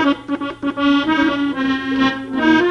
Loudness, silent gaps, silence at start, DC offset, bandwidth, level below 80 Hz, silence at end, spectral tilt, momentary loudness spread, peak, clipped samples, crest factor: -18 LUFS; none; 0 s; under 0.1%; 7 kHz; -48 dBFS; 0 s; -5 dB/octave; 7 LU; -2 dBFS; under 0.1%; 16 dB